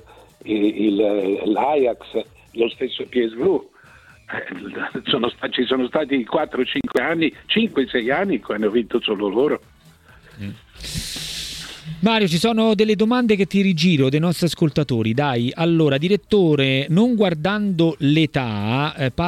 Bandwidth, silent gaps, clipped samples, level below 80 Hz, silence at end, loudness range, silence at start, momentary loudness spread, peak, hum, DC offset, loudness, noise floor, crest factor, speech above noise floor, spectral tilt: 15 kHz; none; under 0.1%; -50 dBFS; 0 s; 6 LU; 0.45 s; 12 LU; -2 dBFS; none; under 0.1%; -20 LUFS; -49 dBFS; 18 dB; 30 dB; -6 dB/octave